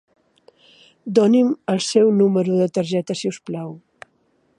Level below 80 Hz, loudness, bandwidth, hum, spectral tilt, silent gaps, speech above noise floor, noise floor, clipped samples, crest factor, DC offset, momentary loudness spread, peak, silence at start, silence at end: -68 dBFS; -19 LUFS; 11 kHz; none; -6 dB/octave; none; 45 dB; -63 dBFS; under 0.1%; 18 dB; under 0.1%; 15 LU; -2 dBFS; 1.05 s; 0.8 s